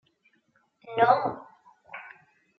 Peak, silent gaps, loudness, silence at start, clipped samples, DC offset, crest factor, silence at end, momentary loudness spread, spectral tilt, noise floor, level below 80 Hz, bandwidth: -8 dBFS; none; -25 LUFS; 0.85 s; under 0.1%; under 0.1%; 22 dB; 0.5 s; 22 LU; -3 dB/octave; -69 dBFS; -74 dBFS; 5.8 kHz